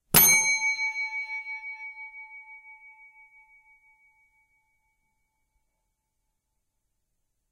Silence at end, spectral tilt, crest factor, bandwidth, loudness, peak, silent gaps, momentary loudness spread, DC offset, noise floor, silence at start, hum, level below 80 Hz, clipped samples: 4.8 s; -0.5 dB/octave; 28 dB; 16 kHz; -22 LUFS; -4 dBFS; none; 28 LU; under 0.1%; -79 dBFS; 0.15 s; none; -58 dBFS; under 0.1%